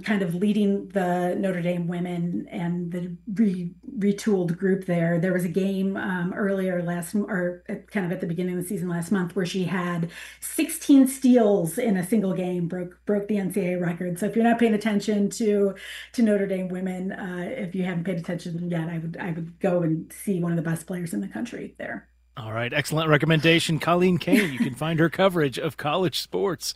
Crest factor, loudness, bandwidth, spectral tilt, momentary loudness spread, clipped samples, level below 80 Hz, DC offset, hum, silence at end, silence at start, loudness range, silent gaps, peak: 22 dB; -25 LUFS; 16 kHz; -6 dB/octave; 11 LU; under 0.1%; -60 dBFS; under 0.1%; none; 0 s; 0 s; 6 LU; none; -2 dBFS